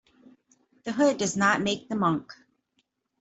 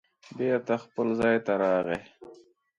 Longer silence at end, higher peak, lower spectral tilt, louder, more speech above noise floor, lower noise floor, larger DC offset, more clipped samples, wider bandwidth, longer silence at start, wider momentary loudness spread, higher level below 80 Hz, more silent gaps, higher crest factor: first, 0.85 s vs 0.45 s; about the same, -8 dBFS vs -10 dBFS; second, -4 dB/octave vs -7 dB/octave; about the same, -25 LUFS vs -27 LUFS; first, 49 dB vs 27 dB; first, -74 dBFS vs -54 dBFS; neither; neither; second, 8.2 kHz vs 10.5 kHz; first, 0.85 s vs 0.3 s; about the same, 10 LU vs 8 LU; about the same, -66 dBFS vs -64 dBFS; neither; about the same, 20 dB vs 18 dB